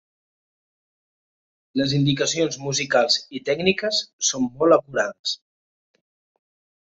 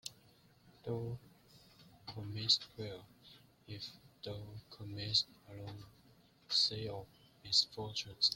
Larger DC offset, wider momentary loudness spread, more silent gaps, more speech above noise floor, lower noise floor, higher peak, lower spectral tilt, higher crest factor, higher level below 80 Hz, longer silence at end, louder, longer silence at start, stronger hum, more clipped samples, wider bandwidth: neither; second, 8 LU vs 19 LU; first, 4.13-4.19 s, 5.19-5.24 s vs none; first, over 68 dB vs 27 dB; first, under -90 dBFS vs -66 dBFS; first, -4 dBFS vs -18 dBFS; about the same, -3.5 dB/octave vs -3 dB/octave; about the same, 22 dB vs 24 dB; first, -62 dBFS vs -70 dBFS; first, 1.5 s vs 0 s; first, -21 LUFS vs -36 LUFS; first, 1.75 s vs 0.05 s; neither; neither; second, 8.2 kHz vs 16.5 kHz